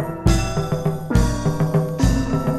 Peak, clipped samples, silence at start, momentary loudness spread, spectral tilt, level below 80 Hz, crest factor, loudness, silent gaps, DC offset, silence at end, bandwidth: -2 dBFS; under 0.1%; 0 s; 4 LU; -6.5 dB/octave; -26 dBFS; 18 dB; -20 LUFS; none; under 0.1%; 0 s; 14.5 kHz